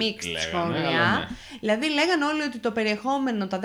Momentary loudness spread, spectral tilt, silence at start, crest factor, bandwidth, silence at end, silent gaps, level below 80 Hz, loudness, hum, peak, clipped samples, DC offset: 6 LU; -4.5 dB/octave; 0 s; 18 dB; 16 kHz; 0 s; none; -54 dBFS; -25 LUFS; none; -8 dBFS; under 0.1%; under 0.1%